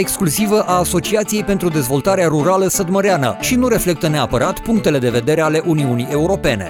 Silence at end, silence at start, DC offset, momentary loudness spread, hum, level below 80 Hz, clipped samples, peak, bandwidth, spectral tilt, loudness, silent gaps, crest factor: 0 s; 0 s; under 0.1%; 3 LU; none; -36 dBFS; under 0.1%; -2 dBFS; 18.5 kHz; -5 dB/octave; -16 LUFS; none; 12 dB